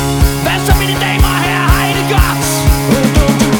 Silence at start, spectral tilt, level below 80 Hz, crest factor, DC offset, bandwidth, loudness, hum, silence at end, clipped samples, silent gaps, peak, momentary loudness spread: 0 s; -4.5 dB/octave; -16 dBFS; 10 dB; under 0.1%; over 20 kHz; -11 LUFS; none; 0 s; under 0.1%; none; 0 dBFS; 2 LU